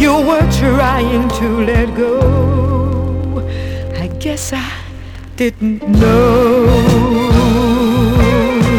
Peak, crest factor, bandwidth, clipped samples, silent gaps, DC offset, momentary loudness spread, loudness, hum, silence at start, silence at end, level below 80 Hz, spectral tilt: -2 dBFS; 10 dB; 19 kHz; under 0.1%; none; under 0.1%; 11 LU; -13 LUFS; none; 0 s; 0 s; -22 dBFS; -6.5 dB/octave